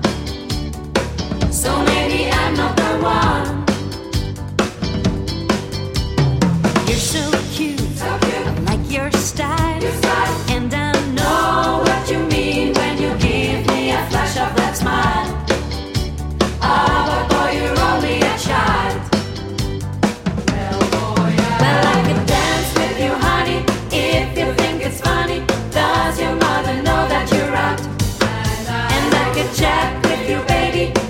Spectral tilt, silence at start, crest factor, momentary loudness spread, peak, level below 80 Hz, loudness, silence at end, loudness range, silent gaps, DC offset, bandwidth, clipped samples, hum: -5 dB/octave; 0 s; 18 dB; 6 LU; 0 dBFS; -30 dBFS; -17 LUFS; 0 s; 2 LU; none; under 0.1%; 16.5 kHz; under 0.1%; none